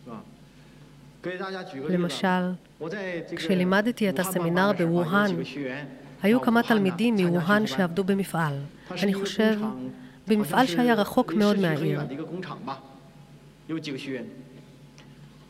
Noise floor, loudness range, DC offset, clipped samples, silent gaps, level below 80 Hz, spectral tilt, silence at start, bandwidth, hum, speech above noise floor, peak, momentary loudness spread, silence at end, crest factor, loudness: -50 dBFS; 7 LU; under 0.1%; under 0.1%; none; -64 dBFS; -6 dB/octave; 0.05 s; 16 kHz; none; 25 dB; -8 dBFS; 15 LU; 0.05 s; 18 dB; -25 LUFS